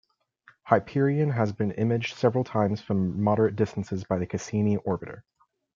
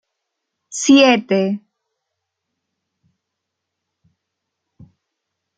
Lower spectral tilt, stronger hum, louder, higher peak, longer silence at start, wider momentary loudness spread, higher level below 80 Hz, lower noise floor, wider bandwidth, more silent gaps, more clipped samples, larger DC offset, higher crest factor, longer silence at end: first, -7.5 dB/octave vs -4 dB/octave; neither; second, -26 LUFS vs -14 LUFS; about the same, -4 dBFS vs -2 dBFS; about the same, 0.65 s vs 0.7 s; second, 6 LU vs 17 LU; first, -62 dBFS vs -68 dBFS; second, -60 dBFS vs -79 dBFS; second, 7.6 kHz vs 9.2 kHz; neither; neither; neither; about the same, 24 dB vs 20 dB; second, 0.55 s vs 4 s